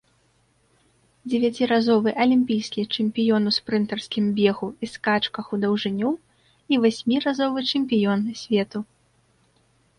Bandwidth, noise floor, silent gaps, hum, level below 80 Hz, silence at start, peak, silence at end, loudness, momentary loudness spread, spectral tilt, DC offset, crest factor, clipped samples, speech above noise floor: 10.5 kHz; -64 dBFS; none; none; -64 dBFS; 1.25 s; -6 dBFS; 1.15 s; -23 LUFS; 8 LU; -6 dB/octave; under 0.1%; 16 dB; under 0.1%; 42 dB